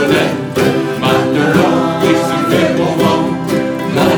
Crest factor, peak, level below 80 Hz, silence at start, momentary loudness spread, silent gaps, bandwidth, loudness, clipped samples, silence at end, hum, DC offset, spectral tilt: 12 dB; 0 dBFS; -46 dBFS; 0 s; 5 LU; none; over 20 kHz; -13 LUFS; under 0.1%; 0 s; none; under 0.1%; -6 dB/octave